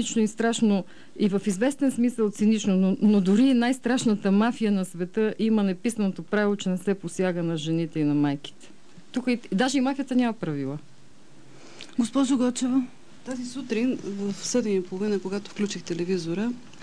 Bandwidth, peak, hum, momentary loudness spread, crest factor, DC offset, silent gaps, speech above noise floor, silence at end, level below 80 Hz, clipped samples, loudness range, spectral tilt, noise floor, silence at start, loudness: 11 kHz; -12 dBFS; none; 10 LU; 14 dB; 0.7%; none; 29 dB; 0.15 s; -68 dBFS; under 0.1%; 6 LU; -5.5 dB/octave; -54 dBFS; 0 s; -25 LUFS